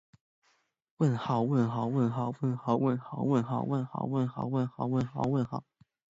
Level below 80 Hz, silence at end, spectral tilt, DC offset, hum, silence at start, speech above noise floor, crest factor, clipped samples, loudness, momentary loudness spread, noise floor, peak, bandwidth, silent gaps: -66 dBFS; 0.5 s; -9 dB/octave; under 0.1%; none; 1 s; 43 dB; 16 dB; under 0.1%; -31 LUFS; 4 LU; -73 dBFS; -14 dBFS; 7.8 kHz; none